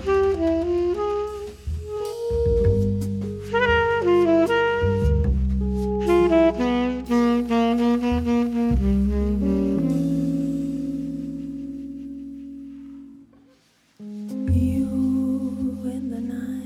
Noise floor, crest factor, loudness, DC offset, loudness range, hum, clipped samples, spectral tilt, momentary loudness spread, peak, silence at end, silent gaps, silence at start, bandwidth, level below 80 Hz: -59 dBFS; 14 dB; -22 LUFS; under 0.1%; 10 LU; none; under 0.1%; -8 dB/octave; 15 LU; -8 dBFS; 0 s; none; 0 s; 14 kHz; -32 dBFS